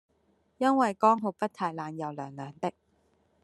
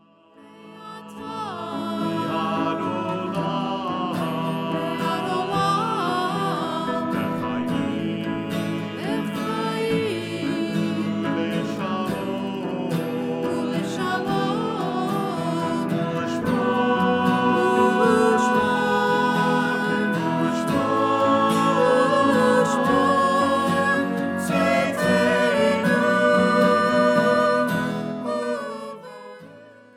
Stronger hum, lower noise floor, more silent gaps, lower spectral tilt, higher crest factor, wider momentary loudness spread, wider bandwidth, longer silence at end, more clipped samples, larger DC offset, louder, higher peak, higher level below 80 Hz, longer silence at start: neither; first, -70 dBFS vs -50 dBFS; neither; about the same, -6.5 dB/octave vs -5.5 dB/octave; about the same, 20 dB vs 16 dB; first, 13 LU vs 9 LU; second, 12 kHz vs 16 kHz; first, 0.75 s vs 0.25 s; neither; neither; second, -29 LUFS vs -22 LUFS; second, -10 dBFS vs -6 dBFS; second, -78 dBFS vs -60 dBFS; first, 0.6 s vs 0.45 s